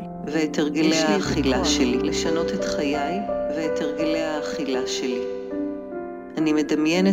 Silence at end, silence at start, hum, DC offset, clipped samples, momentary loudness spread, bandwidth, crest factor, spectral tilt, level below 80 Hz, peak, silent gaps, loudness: 0 s; 0 s; none; under 0.1%; under 0.1%; 9 LU; 15.5 kHz; 16 dB; -4.5 dB/octave; -44 dBFS; -8 dBFS; none; -23 LUFS